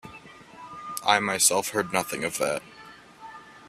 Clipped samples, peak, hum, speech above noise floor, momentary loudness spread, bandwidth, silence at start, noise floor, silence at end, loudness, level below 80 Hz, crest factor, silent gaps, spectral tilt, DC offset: under 0.1%; -4 dBFS; none; 23 dB; 25 LU; 15.5 kHz; 0.05 s; -48 dBFS; 0 s; -24 LUFS; -66 dBFS; 24 dB; none; -1.5 dB/octave; under 0.1%